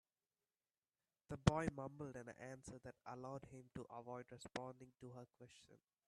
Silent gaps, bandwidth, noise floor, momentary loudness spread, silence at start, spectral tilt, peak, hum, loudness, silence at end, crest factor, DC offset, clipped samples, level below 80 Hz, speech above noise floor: none; 12 kHz; under -90 dBFS; 20 LU; 1.3 s; -6 dB/octave; -18 dBFS; none; -48 LUFS; 0.3 s; 32 dB; under 0.1%; under 0.1%; -66 dBFS; over 42 dB